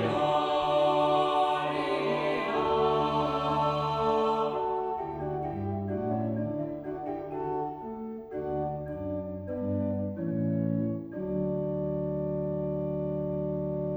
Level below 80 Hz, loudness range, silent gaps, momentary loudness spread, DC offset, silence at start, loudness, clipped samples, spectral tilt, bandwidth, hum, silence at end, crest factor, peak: -54 dBFS; 7 LU; none; 10 LU; under 0.1%; 0 s; -30 LUFS; under 0.1%; -7.5 dB/octave; 10.5 kHz; none; 0 s; 14 dB; -14 dBFS